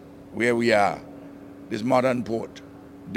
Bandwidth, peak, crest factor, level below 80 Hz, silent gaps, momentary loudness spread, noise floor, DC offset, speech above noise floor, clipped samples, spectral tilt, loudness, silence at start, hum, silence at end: 16 kHz; -6 dBFS; 20 dB; -60 dBFS; none; 23 LU; -42 dBFS; under 0.1%; 20 dB; under 0.1%; -5.5 dB/octave; -23 LUFS; 0 s; none; 0 s